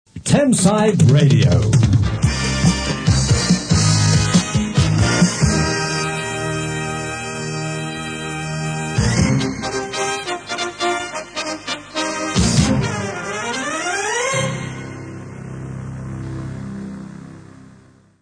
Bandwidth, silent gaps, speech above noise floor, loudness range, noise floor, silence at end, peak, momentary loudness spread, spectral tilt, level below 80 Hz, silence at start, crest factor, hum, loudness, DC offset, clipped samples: 10 kHz; none; 35 dB; 9 LU; -48 dBFS; 0.5 s; 0 dBFS; 16 LU; -5 dB/octave; -34 dBFS; 0.15 s; 18 dB; none; -18 LUFS; under 0.1%; under 0.1%